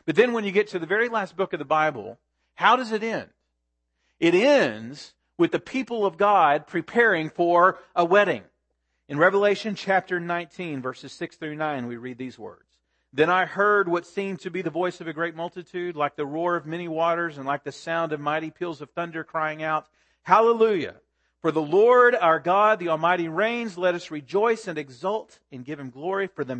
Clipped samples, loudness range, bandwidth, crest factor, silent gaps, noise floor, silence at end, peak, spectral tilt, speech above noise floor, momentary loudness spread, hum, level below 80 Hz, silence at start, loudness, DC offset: under 0.1%; 7 LU; 8.8 kHz; 22 dB; none; -77 dBFS; 0 s; -2 dBFS; -5.5 dB/octave; 53 dB; 15 LU; none; -72 dBFS; 0.05 s; -23 LUFS; under 0.1%